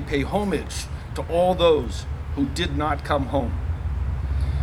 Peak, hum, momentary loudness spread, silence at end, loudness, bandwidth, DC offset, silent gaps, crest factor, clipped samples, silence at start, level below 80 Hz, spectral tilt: -6 dBFS; none; 12 LU; 0 s; -24 LUFS; 13 kHz; under 0.1%; none; 18 dB; under 0.1%; 0 s; -30 dBFS; -6 dB/octave